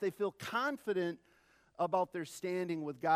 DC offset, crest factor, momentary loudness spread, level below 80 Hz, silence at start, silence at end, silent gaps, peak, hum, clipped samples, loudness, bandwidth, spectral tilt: under 0.1%; 18 dB; 6 LU; -82 dBFS; 0 s; 0 s; none; -18 dBFS; none; under 0.1%; -37 LUFS; 15 kHz; -5.5 dB/octave